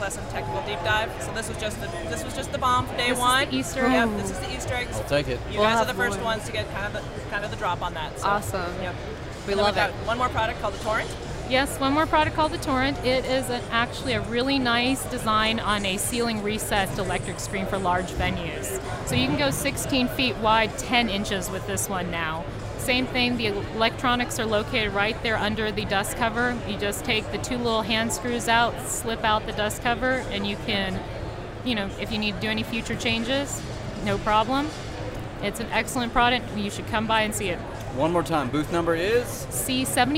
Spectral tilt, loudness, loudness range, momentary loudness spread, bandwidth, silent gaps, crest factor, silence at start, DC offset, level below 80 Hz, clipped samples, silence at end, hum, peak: -4 dB/octave; -25 LUFS; 3 LU; 9 LU; 16 kHz; none; 20 dB; 0 s; under 0.1%; -40 dBFS; under 0.1%; 0 s; none; -6 dBFS